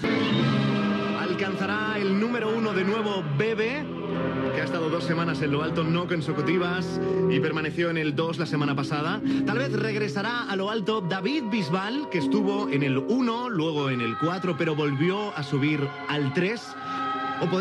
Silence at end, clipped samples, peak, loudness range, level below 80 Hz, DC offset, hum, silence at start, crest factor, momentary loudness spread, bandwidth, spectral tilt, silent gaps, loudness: 0 s; under 0.1%; -12 dBFS; 1 LU; -62 dBFS; under 0.1%; none; 0 s; 14 dB; 4 LU; 11.5 kHz; -7 dB/octave; none; -26 LUFS